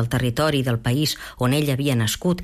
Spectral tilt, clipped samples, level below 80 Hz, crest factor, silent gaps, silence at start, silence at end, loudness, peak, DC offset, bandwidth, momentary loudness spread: -5.5 dB/octave; under 0.1%; -44 dBFS; 12 dB; none; 0 s; 0 s; -21 LUFS; -10 dBFS; under 0.1%; 15 kHz; 2 LU